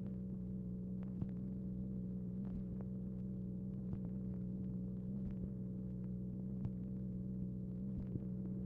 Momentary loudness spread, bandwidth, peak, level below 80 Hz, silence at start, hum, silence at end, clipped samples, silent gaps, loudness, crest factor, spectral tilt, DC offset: 1 LU; 2 kHz; -30 dBFS; -56 dBFS; 0 s; none; 0 s; under 0.1%; none; -45 LUFS; 14 dB; -13.5 dB/octave; under 0.1%